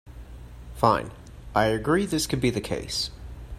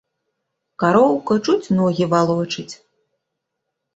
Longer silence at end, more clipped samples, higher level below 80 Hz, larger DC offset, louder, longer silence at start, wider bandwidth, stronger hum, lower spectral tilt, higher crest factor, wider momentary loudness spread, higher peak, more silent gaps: second, 0 s vs 1.2 s; neither; first, -42 dBFS vs -60 dBFS; neither; second, -25 LUFS vs -18 LUFS; second, 0.05 s vs 0.8 s; first, 15 kHz vs 8 kHz; neither; second, -4.5 dB/octave vs -6.5 dB/octave; first, 24 dB vs 18 dB; first, 22 LU vs 11 LU; about the same, -4 dBFS vs -2 dBFS; neither